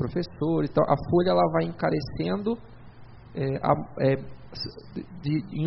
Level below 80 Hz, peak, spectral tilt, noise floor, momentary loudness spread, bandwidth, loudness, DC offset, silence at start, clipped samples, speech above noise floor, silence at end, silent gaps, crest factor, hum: -50 dBFS; -8 dBFS; -6.5 dB/octave; -45 dBFS; 13 LU; 5.8 kHz; -26 LUFS; under 0.1%; 0 s; under 0.1%; 20 dB; 0 s; none; 20 dB; none